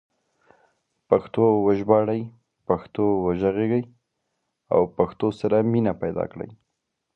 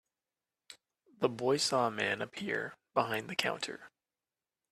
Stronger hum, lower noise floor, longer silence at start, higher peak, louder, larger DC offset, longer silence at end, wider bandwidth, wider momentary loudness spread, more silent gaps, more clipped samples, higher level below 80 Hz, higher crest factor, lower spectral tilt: neither; second, -79 dBFS vs under -90 dBFS; first, 1.1 s vs 0.7 s; first, -2 dBFS vs -10 dBFS; first, -23 LUFS vs -34 LUFS; neither; second, 0.6 s vs 0.85 s; second, 6 kHz vs 14.5 kHz; first, 12 LU vs 8 LU; neither; neither; first, -54 dBFS vs -78 dBFS; about the same, 22 dB vs 26 dB; first, -10 dB/octave vs -3.5 dB/octave